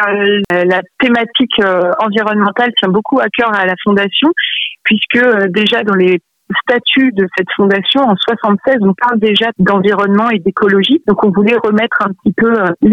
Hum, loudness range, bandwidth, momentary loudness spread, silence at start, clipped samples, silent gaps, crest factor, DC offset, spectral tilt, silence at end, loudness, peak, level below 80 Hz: none; 1 LU; 6.8 kHz; 3 LU; 0 s; under 0.1%; none; 10 dB; under 0.1%; -7 dB/octave; 0 s; -11 LUFS; -2 dBFS; -50 dBFS